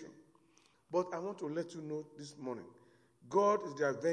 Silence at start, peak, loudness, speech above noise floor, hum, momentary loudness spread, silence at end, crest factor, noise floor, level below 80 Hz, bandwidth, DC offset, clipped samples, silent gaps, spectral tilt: 0 s; -18 dBFS; -37 LUFS; 33 dB; none; 17 LU; 0 s; 20 dB; -70 dBFS; -86 dBFS; 10.5 kHz; under 0.1%; under 0.1%; none; -6 dB/octave